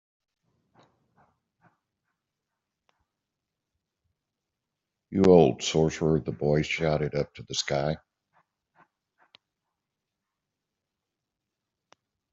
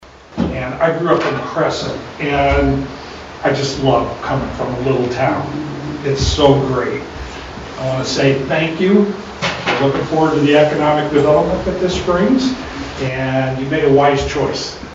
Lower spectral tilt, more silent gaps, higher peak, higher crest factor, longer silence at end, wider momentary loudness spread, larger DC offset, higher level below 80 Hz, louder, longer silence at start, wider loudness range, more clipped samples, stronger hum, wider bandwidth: about the same, -5.5 dB/octave vs -6 dB/octave; neither; second, -4 dBFS vs 0 dBFS; first, 26 dB vs 16 dB; first, 4.35 s vs 0 s; about the same, 13 LU vs 12 LU; neither; second, -56 dBFS vs -34 dBFS; second, -25 LUFS vs -16 LUFS; first, 5.1 s vs 0 s; first, 11 LU vs 3 LU; neither; neither; about the same, 7.8 kHz vs 8 kHz